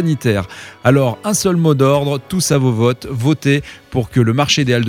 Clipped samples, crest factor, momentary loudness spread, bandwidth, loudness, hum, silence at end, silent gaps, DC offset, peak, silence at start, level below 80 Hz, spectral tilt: under 0.1%; 14 dB; 6 LU; 16.5 kHz; -15 LUFS; none; 0 s; none; under 0.1%; 0 dBFS; 0 s; -44 dBFS; -5.5 dB/octave